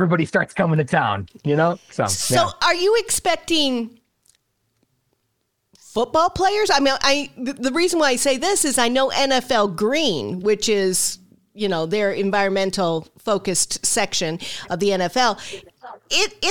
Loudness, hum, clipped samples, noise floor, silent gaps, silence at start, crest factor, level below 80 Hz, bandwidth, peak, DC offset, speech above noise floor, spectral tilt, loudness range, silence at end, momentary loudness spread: -20 LUFS; none; under 0.1%; -72 dBFS; none; 0 s; 18 dB; -52 dBFS; 19 kHz; -2 dBFS; 1%; 52 dB; -3 dB/octave; 4 LU; 0 s; 8 LU